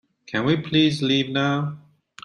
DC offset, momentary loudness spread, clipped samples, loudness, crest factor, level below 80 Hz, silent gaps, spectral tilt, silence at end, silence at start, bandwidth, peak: under 0.1%; 9 LU; under 0.1%; -22 LUFS; 16 dB; -60 dBFS; none; -6 dB/octave; 0.45 s; 0.3 s; 11.5 kHz; -6 dBFS